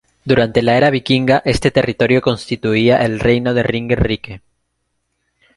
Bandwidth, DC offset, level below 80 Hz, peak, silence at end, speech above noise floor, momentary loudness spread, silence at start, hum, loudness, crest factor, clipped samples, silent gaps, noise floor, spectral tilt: 11.5 kHz; under 0.1%; -36 dBFS; 0 dBFS; 1.2 s; 55 dB; 6 LU; 0.25 s; none; -15 LUFS; 16 dB; under 0.1%; none; -70 dBFS; -6.5 dB/octave